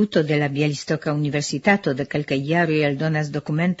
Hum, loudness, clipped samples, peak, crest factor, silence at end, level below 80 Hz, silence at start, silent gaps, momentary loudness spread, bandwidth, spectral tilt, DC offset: none; -21 LUFS; under 0.1%; -4 dBFS; 18 dB; 0.05 s; -58 dBFS; 0 s; none; 5 LU; 8 kHz; -6 dB/octave; under 0.1%